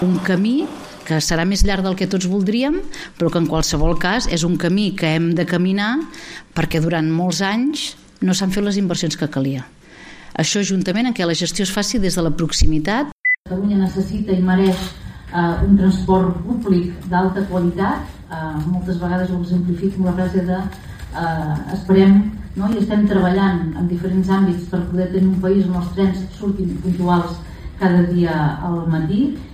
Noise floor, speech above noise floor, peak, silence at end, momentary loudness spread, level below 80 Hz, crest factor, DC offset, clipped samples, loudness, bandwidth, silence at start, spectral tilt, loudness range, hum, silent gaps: -40 dBFS; 22 dB; 0 dBFS; 0 s; 8 LU; -30 dBFS; 16 dB; under 0.1%; under 0.1%; -18 LUFS; 15 kHz; 0 s; -5.5 dB/octave; 3 LU; none; 13.12-13.24 s, 13.38-13.44 s